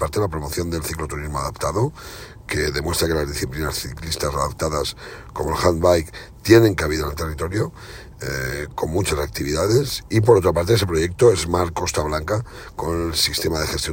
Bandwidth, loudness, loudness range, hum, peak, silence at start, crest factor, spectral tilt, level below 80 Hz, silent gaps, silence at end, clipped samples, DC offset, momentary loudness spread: 17 kHz; -21 LUFS; 5 LU; none; 0 dBFS; 0 s; 20 dB; -5 dB/octave; -36 dBFS; none; 0 s; under 0.1%; under 0.1%; 12 LU